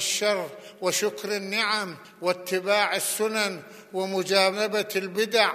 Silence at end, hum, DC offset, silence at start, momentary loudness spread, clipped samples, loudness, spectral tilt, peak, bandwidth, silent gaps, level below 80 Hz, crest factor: 0 s; none; under 0.1%; 0 s; 9 LU; under 0.1%; -25 LUFS; -2 dB/octave; -4 dBFS; 15 kHz; none; -84 dBFS; 22 dB